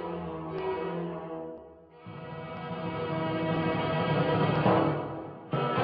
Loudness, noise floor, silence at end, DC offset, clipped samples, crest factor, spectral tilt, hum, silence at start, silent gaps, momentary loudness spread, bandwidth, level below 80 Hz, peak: -31 LUFS; -50 dBFS; 0 s; under 0.1%; under 0.1%; 18 dB; -10.5 dB/octave; none; 0 s; none; 16 LU; 5.2 kHz; -58 dBFS; -12 dBFS